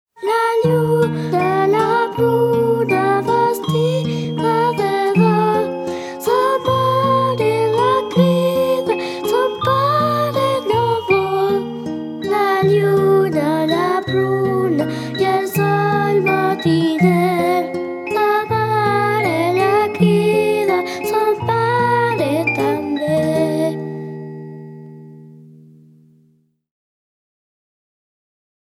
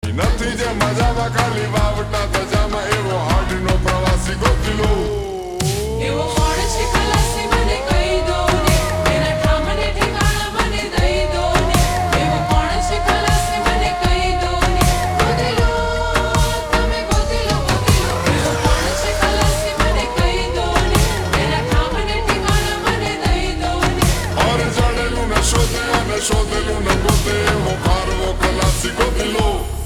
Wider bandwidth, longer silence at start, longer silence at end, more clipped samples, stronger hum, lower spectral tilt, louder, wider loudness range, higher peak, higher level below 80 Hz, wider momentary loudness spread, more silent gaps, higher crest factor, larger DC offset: second, 16.5 kHz vs 20 kHz; first, 0.2 s vs 0.05 s; first, 3.3 s vs 0 s; neither; neither; first, -6.5 dB/octave vs -4.5 dB/octave; about the same, -17 LUFS vs -17 LUFS; about the same, 2 LU vs 2 LU; about the same, -2 dBFS vs -2 dBFS; second, -60 dBFS vs -22 dBFS; first, 7 LU vs 3 LU; neither; about the same, 16 dB vs 14 dB; neither